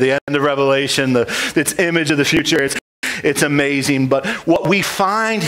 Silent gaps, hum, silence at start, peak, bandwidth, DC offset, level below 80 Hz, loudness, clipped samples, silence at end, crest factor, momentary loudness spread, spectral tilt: 0.21-0.27 s, 2.81-3.02 s; none; 0 s; -2 dBFS; 16.5 kHz; under 0.1%; -50 dBFS; -16 LUFS; under 0.1%; 0 s; 14 dB; 3 LU; -4 dB/octave